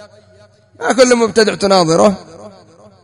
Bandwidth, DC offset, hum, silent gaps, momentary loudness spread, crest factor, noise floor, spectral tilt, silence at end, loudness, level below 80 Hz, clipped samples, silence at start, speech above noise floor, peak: 11 kHz; under 0.1%; none; none; 9 LU; 14 dB; -43 dBFS; -4 dB/octave; 0.55 s; -12 LUFS; -50 dBFS; 0.2%; 0 s; 30 dB; 0 dBFS